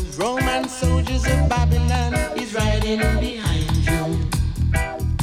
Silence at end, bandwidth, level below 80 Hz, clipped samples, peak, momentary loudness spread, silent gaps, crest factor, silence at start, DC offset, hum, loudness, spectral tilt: 0 s; 15.5 kHz; -24 dBFS; under 0.1%; -6 dBFS; 4 LU; none; 12 dB; 0 s; under 0.1%; none; -21 LUFS; -5.5 dB/octave